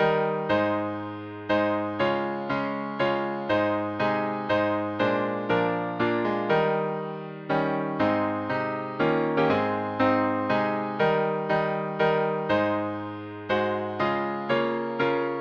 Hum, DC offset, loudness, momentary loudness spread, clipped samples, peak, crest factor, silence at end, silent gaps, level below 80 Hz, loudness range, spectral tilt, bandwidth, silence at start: none; under 0.1%; -26 LUFS; 5 LU; under 0.1%; -10 dBFS; 16 dB; 0 s; none; -62 dBFS; 2 LU; -8 dB/octave; 7.2 kHz; 0 s